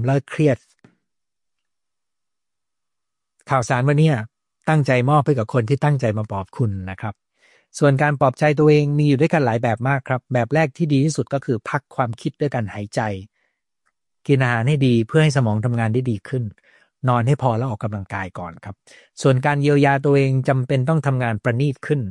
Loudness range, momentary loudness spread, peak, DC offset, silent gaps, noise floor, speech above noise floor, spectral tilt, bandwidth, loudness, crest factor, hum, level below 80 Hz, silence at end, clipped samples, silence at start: 6 LU; 11 LU; -4 dBFS; under 0.1%; none; -86 dBFS; 68 dB; -7 dB/octave; 11 kHz; -19 LUFS; 16 dB; none; -58 dBFS; 0 s; under 0.1%; 0 s